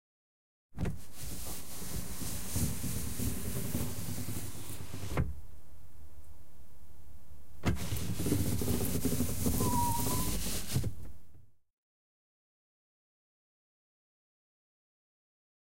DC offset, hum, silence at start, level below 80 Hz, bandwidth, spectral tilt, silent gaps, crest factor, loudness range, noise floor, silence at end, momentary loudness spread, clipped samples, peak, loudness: 2%; none; 0.7 s; -46 dBFS; 16 kHz; -4.5 dB/octave; 11.73-11.83 s; 20 dB; 10 LU; -58 dBFS; 3.85 s; 20 LU; under 0.1%; -16 dBFS; -36 LUFS